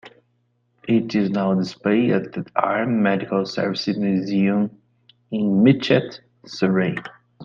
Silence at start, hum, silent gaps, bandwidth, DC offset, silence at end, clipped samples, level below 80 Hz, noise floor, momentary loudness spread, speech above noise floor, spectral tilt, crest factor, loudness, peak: 0.05 s; none; none; 7.2 kHz; under 0.1%; 0 s; under 0.1%; -62 dBFS; -67 dBFS; 13 LU; 47 dB; -7.5 dB/octave; 20 dB; -21 LUFS; -2 dBFS